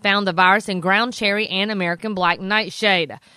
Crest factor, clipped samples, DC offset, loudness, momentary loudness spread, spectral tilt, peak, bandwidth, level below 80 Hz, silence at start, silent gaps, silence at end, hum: 18 dB; under 0.1%; under 0.1%; -18 LUFS; 5 LU; -4.5 dB/octave; -2 dBFS; 14.5 kHz; -62 dBFS; 0.05 s; none; 0.2 s; none